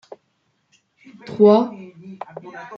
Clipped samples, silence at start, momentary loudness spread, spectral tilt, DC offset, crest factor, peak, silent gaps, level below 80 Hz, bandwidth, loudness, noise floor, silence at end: under 0.1%; 1.3 s; 24 LU; -8.5 dB/octave; under 0.1%; 20 dB; -2 dBFS; none; -68 dBFS; 6.4 kHz; -16 LUFS; -68 dBFS; 0 s